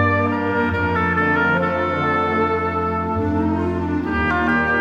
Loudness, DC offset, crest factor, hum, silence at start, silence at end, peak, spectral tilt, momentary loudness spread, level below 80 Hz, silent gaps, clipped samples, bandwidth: -19 LUFS; under 0.1%; 14 dB; none; 0 s; 0 s; -6 dBFS; -8 dB/octave; 4 LU; -38 dBFS; none; under 0.1%; 7.6 kHz